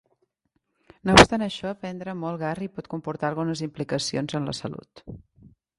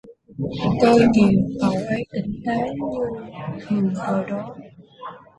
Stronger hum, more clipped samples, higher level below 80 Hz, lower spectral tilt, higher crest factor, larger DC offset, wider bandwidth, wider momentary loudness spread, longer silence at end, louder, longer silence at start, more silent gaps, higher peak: neither; neither; about the same, -44 dBFS vs -48 dBFS; second, -4 dB/octave vs -7.5 dB/octave; first, 26 dB vs 20 dB; neither; first, 13 kHz vs 11 kHz; about the same, 21 LU vs 22 LU; first, 0.6 s vs 0.2 s; second, -24 LUFS vs -21 LUFS; first, 1.05 s vs 0.05 s; neither; about the same, 0 dBFS vs -2 dBFS